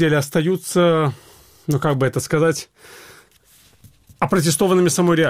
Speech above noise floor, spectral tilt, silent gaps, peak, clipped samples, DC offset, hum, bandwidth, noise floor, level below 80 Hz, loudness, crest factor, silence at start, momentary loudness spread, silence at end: 35 dB; -5 dB/octave; none; -2 dBFS; under 0.1%; under 0.1%; none; 16.5 kHz; -53 dBFS; -52 dBFS; -18 LUFS; 16 dB; 0 s; 11 LU; 0 s